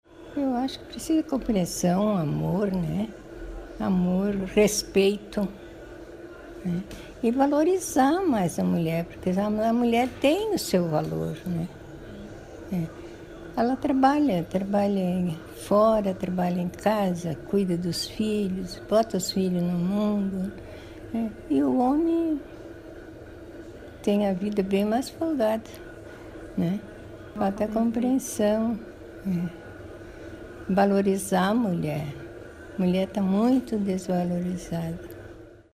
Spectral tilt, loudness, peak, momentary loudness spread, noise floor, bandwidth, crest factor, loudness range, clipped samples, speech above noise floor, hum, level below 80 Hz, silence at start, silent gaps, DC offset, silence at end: -6 dB/octave; -26 LUFS; -8 dBFS; 20 LU; -46 dBFS; 15.5 kHz; 18 dB; 4 LU; under 0.1%; 21 dB; none; -50 dBFS; 0.15 s; none; under 0.1%; 0.2 s